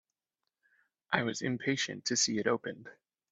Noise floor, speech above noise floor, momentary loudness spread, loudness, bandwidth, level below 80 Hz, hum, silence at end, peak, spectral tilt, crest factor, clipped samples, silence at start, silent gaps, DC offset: -89 dBFS; 56 dB; 7 LU; -32 LUFS; 8.4 kHz; -74 dBFS; none; 0.4 s; -12 dBFS; -3 dB/octave; 24 dB; under 0.1%; 1.1 s; none; under 0.1%